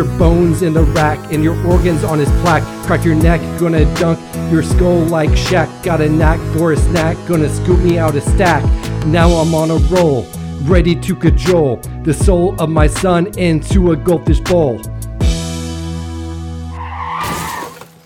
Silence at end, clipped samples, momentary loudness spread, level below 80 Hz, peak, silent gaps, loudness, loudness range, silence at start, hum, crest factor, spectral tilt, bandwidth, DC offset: 0.2 s; under 0.1%; 11 LU; -20 dBFS; 0 dBFS; none; -14 LUFS; 3 LU; 0 s; none; 12 dB; -6.5 dB/octave; 17 kHz; under 0.1%